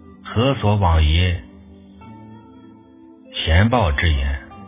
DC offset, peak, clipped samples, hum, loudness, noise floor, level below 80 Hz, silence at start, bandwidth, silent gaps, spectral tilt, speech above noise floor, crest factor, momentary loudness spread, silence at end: under 0.1%; 0 dBFS; under 0.1%; none; -19 LUFS; -45 dBFS; -24 dBFS; 0.25 s; 3.8 kHz; none; -10.5 dB/octave; 29 dB; 20 dB; 11 LU; 0 s